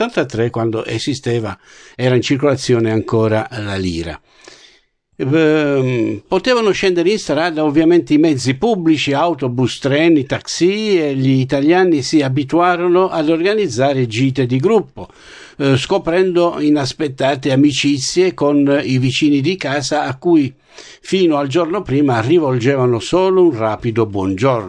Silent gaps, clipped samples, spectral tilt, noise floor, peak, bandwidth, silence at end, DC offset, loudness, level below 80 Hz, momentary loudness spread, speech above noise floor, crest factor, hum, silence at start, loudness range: none; under 0.1%; -6 dB/octave; -54 dBFS; -2 dBFS; 10.5 kHz; 0 s; under 0.1%; -15 LUFS; -48 dBFS; 7 LU; 39 dB; 12 dB; none; 0 s; 3 LU